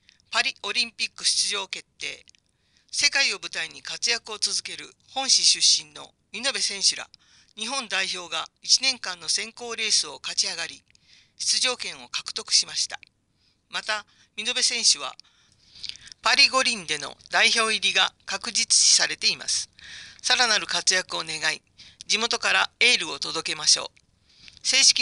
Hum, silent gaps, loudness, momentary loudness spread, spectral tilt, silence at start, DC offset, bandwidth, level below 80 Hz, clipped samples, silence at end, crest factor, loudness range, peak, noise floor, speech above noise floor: none; none; -22 LUFS; 17 LU; 1.5 dB/octave; 0.3 s; under 0.1%; 11.5 kHz; -68 dBFS; under 0.1%; 0 s; 22 dB; 5 LU; -4 dBFS; -67 dBFS; 43 dB